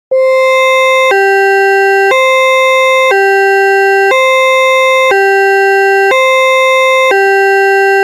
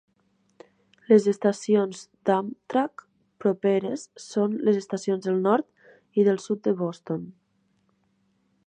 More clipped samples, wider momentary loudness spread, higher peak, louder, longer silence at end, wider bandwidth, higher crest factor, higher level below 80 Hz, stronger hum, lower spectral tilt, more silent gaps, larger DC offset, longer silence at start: neither; second, 0 LU vs 12 LU; first, -2 dBFS vs -6 dBFS; first, -7 LUFS vs -25 LUFS; second, 0 s vs 1.35 s; first, 17 kHz vs 9.6 kHz; second, 6 dB vs 20 dB; first, -62 dBFS vs -76 dBFS; neither; second, -0.5 dB/octave vs -6.5 dB/octave; neither; neither; second, 0.1 s vs 1.1 s